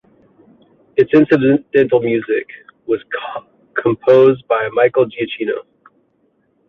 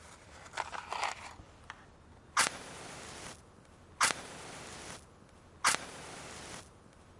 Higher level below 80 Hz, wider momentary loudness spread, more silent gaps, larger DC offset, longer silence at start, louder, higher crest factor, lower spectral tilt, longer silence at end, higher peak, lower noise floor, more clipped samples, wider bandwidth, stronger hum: first, -58 dBFS vs -64 dBFS; second, 14 LU vs 21 LU; neither; neither; first, 0.95 s vs 0 s; first, -15 LUFS vs -36 LUFS; second, 14 dB vs 32 dB; first, -8.5 dB/octave vs -0.5 dB/octave; first, 1.05 s vs 0 s; first, -2 dBFS vs -8 dBFS; about the same, -61 dBFS vs -58 dBFS; neither; second, 5 kHz vs 11.5 kHz; neither